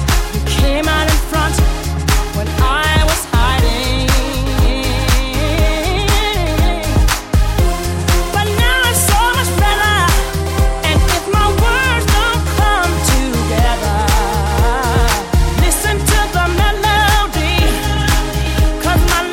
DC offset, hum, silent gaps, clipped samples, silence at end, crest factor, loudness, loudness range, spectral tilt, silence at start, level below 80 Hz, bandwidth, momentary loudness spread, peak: under 0.1%; none; none; under 0.1%; 0 s; 12 dB; -14 LUFS; 2 LU; -4 dB/octave; 0 s; -16 dBFS; 17 kHz; 4 LU; 0 dBFS